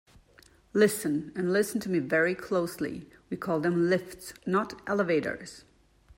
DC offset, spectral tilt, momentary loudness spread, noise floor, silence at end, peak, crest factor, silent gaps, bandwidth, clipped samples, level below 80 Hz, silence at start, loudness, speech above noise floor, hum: under 0.1%; -5.5 dB/octave; 14 LU; -59 dBFS; 0.6 s; -10 dBFS; 18 dB; none; 16 kHz; under 0.1%; -64 dBFS; 0.75 s; -29 LUFS; 31 dB; none